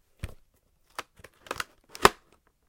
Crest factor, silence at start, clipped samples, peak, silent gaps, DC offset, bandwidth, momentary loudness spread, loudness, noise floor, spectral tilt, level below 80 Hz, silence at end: 30 dB; 0.25 s; under 0.1%; -2 dBFS; none; under 0.1%; 17 kHz; 21 LU; -27 LUFS; -67 dBFS; -3 dB/octave; -50 dBFS; 0.55 s